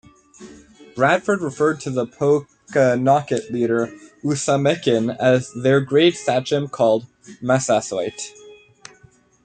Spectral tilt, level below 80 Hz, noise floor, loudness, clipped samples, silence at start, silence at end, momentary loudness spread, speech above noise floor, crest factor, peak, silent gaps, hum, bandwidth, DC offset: -5 dB/octave; -60 dBFS; -53 dBFS; -19 LUFS; under 0.1%; 0.4 s; 0.9 s; 9 LU; 34 dB; 18 dB; -4 dBFS; none; none; 9.4 kHz; under 0.1%